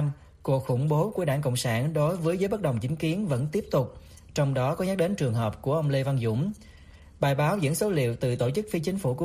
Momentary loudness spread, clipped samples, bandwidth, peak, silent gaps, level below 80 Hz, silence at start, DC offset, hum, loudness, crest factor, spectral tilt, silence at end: 4 LU; under 0.1%; 15.5 kHz; -10 dBFS; none; -54 dBFS; 0 s; under 0.1%; none; -27 LUFS; 16 dB; -6.5 dB/octave; 0 s